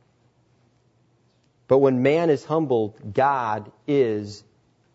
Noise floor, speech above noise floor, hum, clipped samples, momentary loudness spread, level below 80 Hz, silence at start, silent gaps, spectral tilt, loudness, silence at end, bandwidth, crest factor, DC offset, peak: -63 dBFS; 42 dB; none; under 0.1%; 12 LU; -66 dBFS; 1.7 s; none; -7.5 dB/octave; -22 LUFS; 0.55 s; 8 kHz; 18 dB; under 0.1%; -6 dBFS